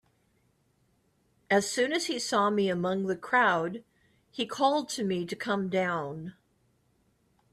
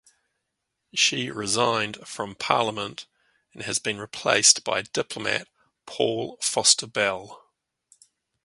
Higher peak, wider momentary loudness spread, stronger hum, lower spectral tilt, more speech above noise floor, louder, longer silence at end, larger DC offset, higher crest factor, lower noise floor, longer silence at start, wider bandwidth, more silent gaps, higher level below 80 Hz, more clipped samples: second, -12 dBFS vs -2 dBFS; second, 12 LU vs 16 LU; neither; first, -4 dB/octave vs -1 dB/octave; second, 42 dB vs 55 dB; second, -28 LUFS vs -23 LUFS; first, 1.2 s vs 1.05 s; neither; second, 18 dB vs 26 dB; second, -70 dBFS vs -80 dBFS; first, 1.5 s vs 0.95 s; first, 14.5 kHz vs 12 kHz; neither; second, -72 dBFS vs -66 dBFS; neither